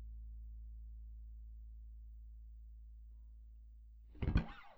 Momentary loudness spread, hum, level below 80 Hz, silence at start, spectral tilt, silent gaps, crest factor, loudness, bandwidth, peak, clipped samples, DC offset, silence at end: 21 LU; none; -48 dBFS; 0 s; -8.5 dB/octave; none; 26 dB; -48 LUFS; 5.8 kHz; -20 dBFS; under 0.1%; under 0.1%; 0 s